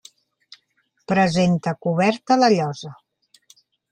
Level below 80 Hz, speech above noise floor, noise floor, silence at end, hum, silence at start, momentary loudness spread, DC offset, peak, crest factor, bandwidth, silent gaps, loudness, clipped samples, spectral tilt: -60 dBFS; 49 dB; -68 dBFS; 1 s; none; 1.1 s; 11 LU; under 0.1%; -4 dBFS; 18 dB; 9.8 kHz; none; -19 LUFS; under 0.1%; -6 dB/octave